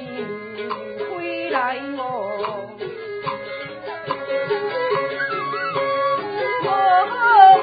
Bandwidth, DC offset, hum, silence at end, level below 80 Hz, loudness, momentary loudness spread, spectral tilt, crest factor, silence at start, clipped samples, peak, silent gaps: 5 kHz; under 0.1%; none; 0 s; -66 dBFS; -21 LUFS; 14 LU; -9 dB/octave; 20 dB; 0 s; under 0.1%; 0 dBFS; none